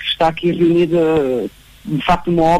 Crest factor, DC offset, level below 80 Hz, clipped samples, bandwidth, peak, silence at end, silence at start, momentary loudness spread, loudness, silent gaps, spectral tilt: 12 dB; under 0.1%; -38 dBFS; under 0.1%; 13 kHz; -4 dBFS; 0 s; 0 s; 10 LU; -16 LUFS; none; -7 dB/octave